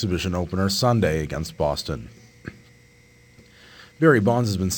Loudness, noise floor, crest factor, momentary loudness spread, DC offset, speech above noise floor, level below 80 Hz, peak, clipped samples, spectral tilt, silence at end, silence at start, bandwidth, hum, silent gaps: -22 LUFS; -53 dBFS; 18 dB; 23 LU; under 0.1%; 32 dB; -44 dBFS; -4 dBFS; under 0.1%; -5.5 dB/octave; 0 s; 0 s; 19 kHz; 60 Hz at -50 dBFS; none